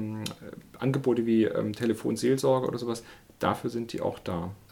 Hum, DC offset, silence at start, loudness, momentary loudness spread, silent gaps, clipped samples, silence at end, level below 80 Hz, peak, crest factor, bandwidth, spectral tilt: none; under 0.1%; 0 s; -29 LUFS; 11 LU; none; under 0.1%; 0.15 s; -60 dBFS; -10 dBFS; 18 dB; 18.5 kHz; -6.5 dB/octave